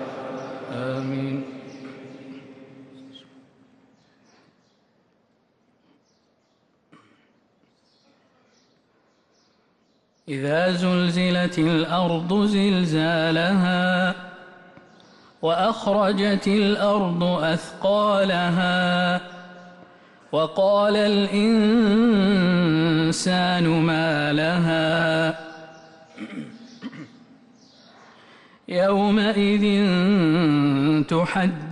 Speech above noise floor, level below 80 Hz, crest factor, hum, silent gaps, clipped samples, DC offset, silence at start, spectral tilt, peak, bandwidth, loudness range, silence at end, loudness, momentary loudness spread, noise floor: 45 dB; -58 dBFS; 12 dB; none; none; under 0.1%; under 0.1%; 0 s; -6 dB/octave; -10 dBFS; 11 kHz; 13 LU; 0 s; -21 LUFS; 19 LU; -65 dBFS